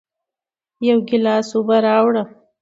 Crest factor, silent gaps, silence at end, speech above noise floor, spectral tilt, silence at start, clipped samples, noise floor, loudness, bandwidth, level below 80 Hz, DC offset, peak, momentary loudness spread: 16 dB; none; 0.35 s; 72 dB; -6 dB/octave; 0.8 s; under 0.1%; -88 dBFS; -17 LUFS; 8 kHz; -68 dBFS; under 0.1%; -2 dBFS; 8 LU